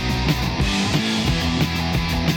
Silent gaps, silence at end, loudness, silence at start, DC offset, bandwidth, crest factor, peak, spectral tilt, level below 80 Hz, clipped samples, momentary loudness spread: none; 0 s; -20 LUFS; 0 s; under 0.1%; 19 kHz; 14 dB; -6 dBFS; -5 dB/octave; -28 dBFS; under 0.1%; 1 LU